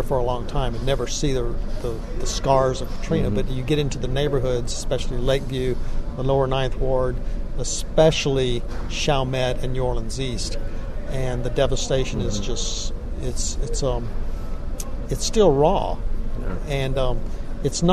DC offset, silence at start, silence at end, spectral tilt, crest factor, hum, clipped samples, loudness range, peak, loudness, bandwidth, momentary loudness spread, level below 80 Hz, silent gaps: under 0.1%; 0 s; 0 s; -5 dB/octave; 18 dB; none; under 0.1%; 3 LU; -4 dBFS; -24 LUFS; 13 kHz; 12 LU; -26 dBFS; none